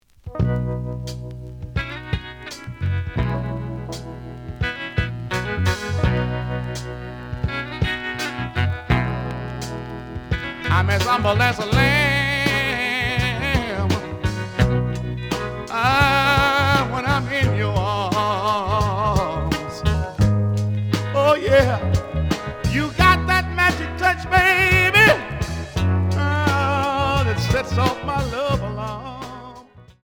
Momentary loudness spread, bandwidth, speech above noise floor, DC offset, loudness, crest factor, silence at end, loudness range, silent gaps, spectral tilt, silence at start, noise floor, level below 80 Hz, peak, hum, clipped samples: 14 LU; 20 kHz; 26 dB; under 0.1%; -20 LUFS; 18 dB; 0.1 s; 9 LU; none; -5.5 dB/octave; 0.25 s; -44 dBFS; -34 dBFS; -2 dBFS; none; under 0.1%